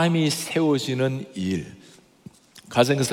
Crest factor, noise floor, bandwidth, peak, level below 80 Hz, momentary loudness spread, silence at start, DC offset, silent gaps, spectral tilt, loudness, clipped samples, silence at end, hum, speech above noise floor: 20 dB; -49 dBFS; 17.5 kHz; -4 dBFS; -64 dBFS; 8 LU; 0 s; under 0.1%; none; -5 dB/octave; -24 LUFS; under 0.1%; 0 s; none; 26 dB